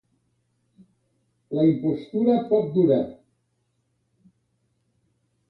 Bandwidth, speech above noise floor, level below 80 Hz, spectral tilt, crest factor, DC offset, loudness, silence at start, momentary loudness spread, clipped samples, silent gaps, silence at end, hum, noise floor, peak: 4.8 kHz; 51 dB; -66 dBFS; -11 dB/octave; 18 dB; under 0.1%; -22 LUFS; 1.5 s; 7 LU; under 0.1%; none; 2.35 s; none; -72 dBFS; -8 dBFS